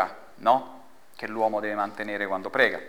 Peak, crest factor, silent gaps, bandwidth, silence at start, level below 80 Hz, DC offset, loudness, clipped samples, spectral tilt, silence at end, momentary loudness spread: -6 dBFS; 22 dB; none; over 20 kHz; 0 s; -72 dBFS; 0.4%; -27 LUFS; under 0.1%; -5 dB/octave; 0 s; 11 LU